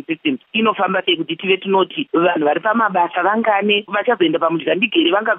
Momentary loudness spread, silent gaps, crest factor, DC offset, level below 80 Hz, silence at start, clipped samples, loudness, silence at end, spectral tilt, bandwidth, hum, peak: 4 LU; none; 14 dB; under 0.1%; -76 dBFS; 0.1 s; under 0.1%; -17 LUFS; 0 s; -9 dB/octave; 3.9 kHz; none; -2 dBFS